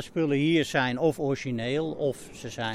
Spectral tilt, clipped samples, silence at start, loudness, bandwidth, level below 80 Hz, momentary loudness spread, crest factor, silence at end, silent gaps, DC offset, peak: -5.5 dB/octave; under 0.1%; 0 s; -27 LUFS; 15 kHz; -56 dBFS; 9 LU; 16 dB; 0 s; none; under 0.1%; -10 dBFS